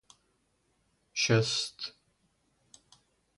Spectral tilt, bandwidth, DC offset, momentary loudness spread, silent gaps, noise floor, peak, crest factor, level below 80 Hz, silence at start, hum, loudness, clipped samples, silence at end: -3.5 dB/octave; 11.5 kHz; under 0.1%; 16 LU; none; -74 dBFS; -12 dBFS; 24 dB; -70 dBFS; 1.15 s; none; -30 LUFS; under 0.1%; 1.5 s